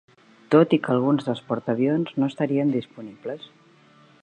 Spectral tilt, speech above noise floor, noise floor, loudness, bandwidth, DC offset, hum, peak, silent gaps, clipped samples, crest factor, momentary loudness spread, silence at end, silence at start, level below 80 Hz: -8.5 dB/octave; 32 dB; -54 dBFS; -22 LUFS; 9.2 kHz; under 0.1%; none; -4 dBFS; none; under 0.1%; 20 dB; 16 LU; 0.75 s; 0.5 s; -72 dBFS